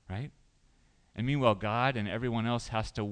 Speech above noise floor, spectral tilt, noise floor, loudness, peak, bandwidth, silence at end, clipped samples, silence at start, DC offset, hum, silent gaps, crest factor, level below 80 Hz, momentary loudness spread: 35 dB; -6.5 dB/octave; -66 dBFS; -31 LUFS; -12 dBFS; 10 kHz; 0 s; under 0.1%; 0.1 s; under 0.1%; none; none; 20 dB; -52 dBFS; 13 LU